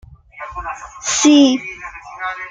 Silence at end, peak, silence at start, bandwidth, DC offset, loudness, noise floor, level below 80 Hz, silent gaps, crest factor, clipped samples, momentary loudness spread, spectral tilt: 0 s; -2 dBFS; 0.35 s; 9.4 kHz; under 0.1%; -14 LUFS; -35 dBFS; -46 dBFS; none; 16 dB; under 0.1%; 21 LU; -2 dB/octave